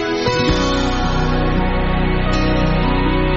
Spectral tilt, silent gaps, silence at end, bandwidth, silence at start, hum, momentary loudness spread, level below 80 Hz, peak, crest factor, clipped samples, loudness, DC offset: -5 dB/octave; none; 0 s; 8 kHz; 0 s; none; 2 LU; -20 dBFS; -4 dBFS; 12 dB; under 0.1%; -17 LUFS; under 0.1%